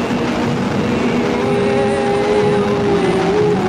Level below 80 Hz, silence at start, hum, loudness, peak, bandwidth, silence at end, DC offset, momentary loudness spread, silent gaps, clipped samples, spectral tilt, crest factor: -40 dBFS; 0 s; none; -16 LUFS; -4 dBFS; 11.5 kHz; 0 s; under 0.1%; 3 LU; none; under 0.1%; -6.5 dB/octave; 10 dB